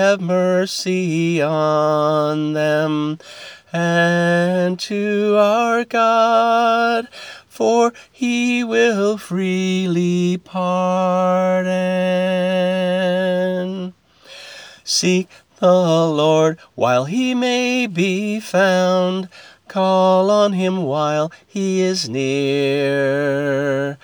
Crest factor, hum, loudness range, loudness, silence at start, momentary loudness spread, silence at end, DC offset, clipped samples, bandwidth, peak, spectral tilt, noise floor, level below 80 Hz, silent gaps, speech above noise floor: 14 dB; none; 3 LU; -17 LUFS; 0 s; 9 LU; 0.1 s; under 0.1%; under 0.1%; 20 kHz; -2 dBFS; -5.5 dB/octave; -41 dBFS; -68 dBFS; none; 24 dB